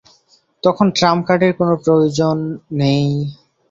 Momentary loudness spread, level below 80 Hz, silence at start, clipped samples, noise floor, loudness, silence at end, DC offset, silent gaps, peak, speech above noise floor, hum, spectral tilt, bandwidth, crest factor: 8 LU; -54 dBFS; 0.65 s; under 0.1%; -56 dBFS; -16 LUFS; 0.35 s; under 0.1%; none; -2 dBFS; 41 dB; none; -6.5 dB/octave; 7.8 kHz; 14 dB